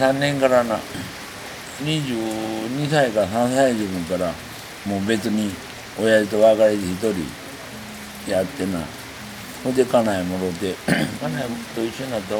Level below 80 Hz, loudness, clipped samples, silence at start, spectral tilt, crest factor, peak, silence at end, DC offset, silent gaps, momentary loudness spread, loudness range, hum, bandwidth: -52 dBFS; -21 LUFS; under 0.1%; 0 s; -5 dB/octave; 18 dB; -4 dBFS; 0 s; under 0.1%; none; 15 LU; 4 LU; none; over 20 kHz